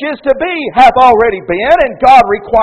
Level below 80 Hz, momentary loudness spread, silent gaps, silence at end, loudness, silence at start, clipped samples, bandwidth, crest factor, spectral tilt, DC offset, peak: -34 dBFS; 8 LU; none; 0 s; -8 LUFS; 0 s; 3%; 9.4 kHz; 8 dB; -5 dB/octave; under 0.1%; 0 dBFS